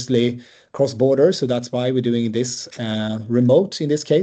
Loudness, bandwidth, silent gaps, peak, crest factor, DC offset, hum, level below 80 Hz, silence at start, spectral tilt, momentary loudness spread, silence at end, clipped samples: -19 LUFS; 8.8 kHz; none; -4 dBFS; 16 dB; under 0.1%; none; -64 dBFS; 0 s; -6 dB/octave; 10 LU; 0 s; under 0.1%